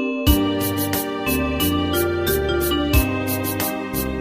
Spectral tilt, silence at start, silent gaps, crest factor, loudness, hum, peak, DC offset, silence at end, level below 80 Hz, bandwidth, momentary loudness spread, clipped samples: -5 dB/octave; 0 s; none; 18 dB; -21 LUFS; none; -2 dBFS; under 0.1%; 0 s; -28 dBFS; 15.5 kHz; 4 LU; under 0.1%